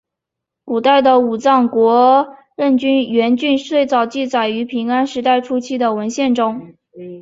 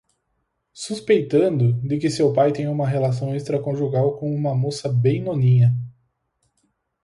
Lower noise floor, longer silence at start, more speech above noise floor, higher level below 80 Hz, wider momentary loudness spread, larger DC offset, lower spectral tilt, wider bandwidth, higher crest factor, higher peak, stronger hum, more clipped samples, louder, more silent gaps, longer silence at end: first, -81 dBFS vs -73 dBFS; about the same, 0.65 s vs 0.75 s; first, 67 dB vs 53 dB; about the same, -62 dBFS vs -58 dBFS; about the same, 9 LU vs 8 LU; neither; second, -4.5 dB/octave vs -7.5 dB/octave; second, 7.8 kHz vs 11 kHz; about the same, 14 dB vs 16 dB; first, -2 dBFS vs -6 dBFS; neither; neither; first, -15 LUFS vs -21 LUFS; neither; second, 0 s vs 1.15 s